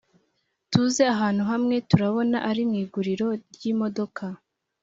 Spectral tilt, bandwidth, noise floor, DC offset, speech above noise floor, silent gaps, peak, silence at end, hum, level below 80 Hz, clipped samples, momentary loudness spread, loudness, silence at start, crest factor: -6 dB/octave; 7.8 kHz; -73 dBFS; under 0.1%; 49 dB; none; -4 dBFS; 0.45 s; none; -60 dBFS; under 0.1%; 10 LU; -24 LUFS; 0.7 s; 22 dB